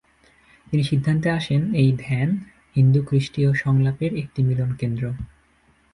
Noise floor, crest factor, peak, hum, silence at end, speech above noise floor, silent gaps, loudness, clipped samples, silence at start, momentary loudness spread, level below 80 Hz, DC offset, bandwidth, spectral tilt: -60 dBFS; 14 dB; -6 dBFS; none; 0.7 s; 39 dB; none; -22 LUFS; under 0.1%; 0.7 s; 9 LU; -48 dBFS; under 0.1%; 10.5 kHz; -8 dB/octave